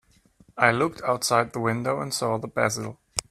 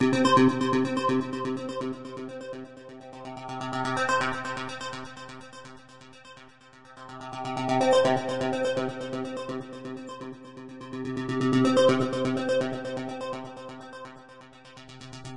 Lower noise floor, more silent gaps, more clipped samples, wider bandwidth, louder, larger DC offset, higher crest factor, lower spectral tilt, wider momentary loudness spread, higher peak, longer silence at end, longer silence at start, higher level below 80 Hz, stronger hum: first, -58 dBFS vs -52 dBFS; neither; neither; first, 15.5 kHz vs 11.5 kHz; about the same, -25 LUFS vs -27 LUFS; second, under 0.1% vs 0.2%; first, 24 dB vs 18 dB; second, -4 dB/octave vs -5.5 dB/octave; second, 10 LU vs 23 LU; first, -2 dBFS vs -10 dBFS; about the same, 0.1 s vs 0 s; first, 0.55 s vs 0 s; about the same, -58 dBFS vs -60 dBFS; neither